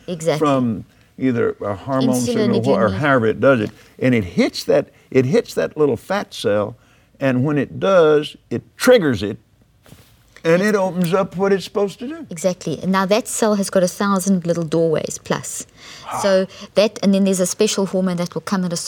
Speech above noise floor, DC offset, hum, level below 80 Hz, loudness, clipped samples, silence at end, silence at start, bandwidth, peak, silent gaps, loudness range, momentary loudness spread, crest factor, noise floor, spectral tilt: 31 dB; under 0.1%; none; -54 dBFS; -18 LUFS; under 0.1%; 0 s; 0.1 s; 19 kHz; 0 dBFS; none; 2 LU; 9 LU; 18 dB; -49 dBFS; -5.5 dB/octave